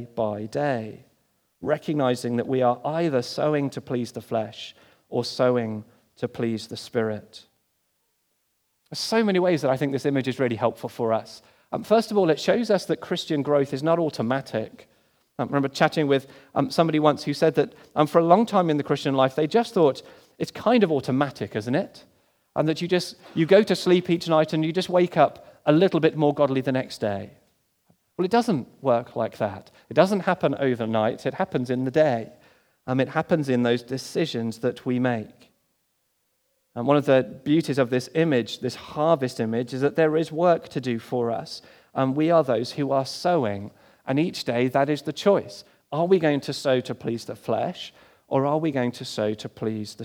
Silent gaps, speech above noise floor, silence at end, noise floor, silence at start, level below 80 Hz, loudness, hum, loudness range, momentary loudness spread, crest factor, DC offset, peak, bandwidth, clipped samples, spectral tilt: none; 49 dB; 0 s; -72 dBFS; 0 s; -70 dBFS; -24 LUFS; none; 6 LU; 11 LU; 22 dB; under 0.1%; -2 dBFS; 18.5 kHz; under 0.1%; -6.5 dB/octave